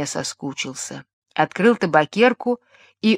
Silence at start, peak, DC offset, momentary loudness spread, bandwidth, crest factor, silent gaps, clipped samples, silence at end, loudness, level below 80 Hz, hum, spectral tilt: 0 s; 0 dBFS; under 0.1%; 14 LU; 13.5 kHz; 20 dB; 1.13-1.22 s; under 0.1%; 0 s; -21 LUFS; -68 dBFS; none; -4.5 dB/octave